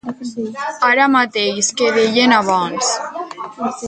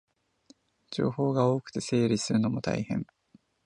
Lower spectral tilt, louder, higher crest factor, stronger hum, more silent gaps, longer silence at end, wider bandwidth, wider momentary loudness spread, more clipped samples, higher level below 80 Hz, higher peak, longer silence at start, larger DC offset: second, -2.5 dB/octave vs -6 dB/octave; first, -15 LUFS vs -29 LUFS; about the same, 16 dB vs 18 dB; neither; neither; second, 0 s vs 0.6 s; about the same, 9.6 kHz vs 10.5 kHz; first, 14 LU vs 8 LU; neither; about the same, -62 dBFS vs -62 dBFS; first, 0 dBFS vs -10 dBFS; second, 0.05 s vs 0.9 s; neither